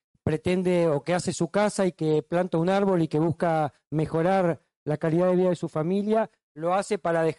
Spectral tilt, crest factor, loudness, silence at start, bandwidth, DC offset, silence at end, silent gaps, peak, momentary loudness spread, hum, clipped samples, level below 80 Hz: -6.5 dB/octave; 12 dB; -25 LUFS; 0.25 s; 11.5 kHz; under 0.1%; 0.05 s; 4.76-4.86 s, 6.43-6.55 s; -14 dBFS; 6 LU; none; under 0.1%; -58 dBFS